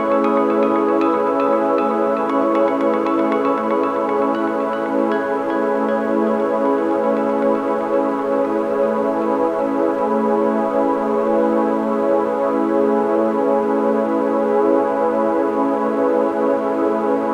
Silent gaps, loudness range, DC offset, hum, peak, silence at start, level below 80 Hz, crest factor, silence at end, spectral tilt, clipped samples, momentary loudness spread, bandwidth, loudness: none; 1 LU; under 0.1%; none; -4 dBFS; 0 s; -58 dBFS; 14 dB; 0 s; -7.5 dB/octave; under 0.1%; 2 LU; 10.5 kHz; -18 LUFS